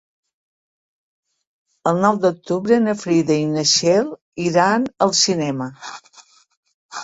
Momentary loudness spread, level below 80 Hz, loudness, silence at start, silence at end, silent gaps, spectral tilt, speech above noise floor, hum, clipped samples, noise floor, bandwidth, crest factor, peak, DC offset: 14 LU; -62 dBFS; -18 LUFS; 1.85 s; 0 s; 4.22-4.32 s, 6.57-6.63 s, 6.74-6.89 s; -4 dB/octave; 33 dB; none; under 0.1%; -50 dBFS; 8 kHz; 18 dB; -2 dBFS; under 0.1%